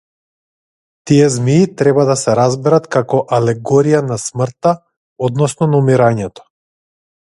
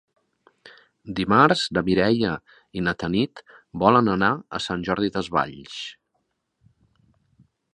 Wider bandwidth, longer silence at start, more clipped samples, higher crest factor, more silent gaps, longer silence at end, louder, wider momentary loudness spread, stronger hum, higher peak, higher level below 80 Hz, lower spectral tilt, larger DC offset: about the same, 11.5 kHz vs 10.5 kHz; first, 1.05 s vs 0.65 s; neither; second, 14 dB vs 22 dB; first, 4.97-5.16 s vs none; second, 1.1 s vs 1.8 s; first, -14 LUFS vs -22 LUFS; second, 8 LU vs 17 LU; neither; about the same, 0 dBFS vs -2 dBFS; about the same, -52 dBFS vs -52 dBFS; about the same, -6.5 dB/octave vs -6 dB/octave; neither